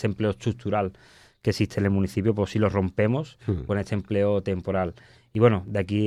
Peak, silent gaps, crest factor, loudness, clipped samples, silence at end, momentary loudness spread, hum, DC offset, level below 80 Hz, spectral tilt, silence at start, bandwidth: -8 dBFS; none; 18 dB; -26 LUFS; under 0.1%; 0 s; 8 LU; none; under 0.1%; -50 dBFS; -7.5 dB/octave; 0 s; 12 kHz